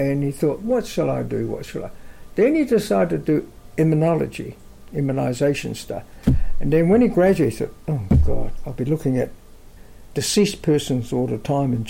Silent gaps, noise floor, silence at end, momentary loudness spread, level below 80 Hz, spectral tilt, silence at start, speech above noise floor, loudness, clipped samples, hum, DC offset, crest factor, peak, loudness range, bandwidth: none; -42 dBFS; 0 s; 13 LU; -32 dBFS; -6.5 dB/octave; 0 s; 22 dB; -21 LUFS; under 0.1%; none; under 0.1%; 14 dB; -6 dBFS; 3 LU; 16.5 kHz